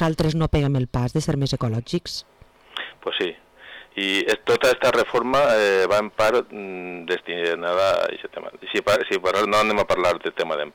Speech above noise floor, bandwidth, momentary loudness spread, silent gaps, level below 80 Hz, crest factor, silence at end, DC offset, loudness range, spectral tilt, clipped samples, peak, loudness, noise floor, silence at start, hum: 23 dB; 19 kHz; 15 LU; none; -44 dBFS; 10 dB; 0.05 s; under 0.1%; 6 LU; -5 dB/octave; under 0.1%; -12 dBFS; -22 LUFS; -44 dBFS; 0 s; none